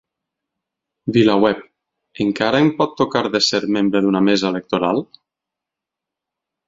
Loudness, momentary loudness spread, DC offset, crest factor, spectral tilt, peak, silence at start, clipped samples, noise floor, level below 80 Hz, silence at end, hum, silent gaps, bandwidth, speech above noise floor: -17 LUFS; 7 LU; under 0.1%; 18 dB; -5 dB/octave; 0 dBFS; 1.05 s; under 0.1%; -85 dBFS; -56 dBFS; 1.65 s; none; none; 7.8 kHz; 68 dB